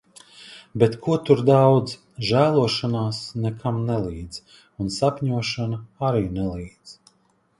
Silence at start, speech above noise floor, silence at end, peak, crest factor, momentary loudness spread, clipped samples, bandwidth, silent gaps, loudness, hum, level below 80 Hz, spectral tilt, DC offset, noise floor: 0.4 s; 42 dB; 0.65 s; -2 dBFS; 20 dB; 18 LU; under 0.1%; 11.5 kHz; none; -22 LUFS; none; -48 dBFS; -6.5 dB/octave; under 0.1%; -64 dBFS